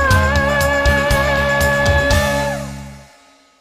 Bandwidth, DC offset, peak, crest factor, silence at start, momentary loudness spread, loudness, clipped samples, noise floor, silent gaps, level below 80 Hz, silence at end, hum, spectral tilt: 16 kHz; under 0.1%; -2 dBFS; 14 dB; 0 s; 10 LU; -15 LUFS; under 0.1%; -49 dBFS; none; -24 dBFS; 0.55 s; none; -4.5 dB/octave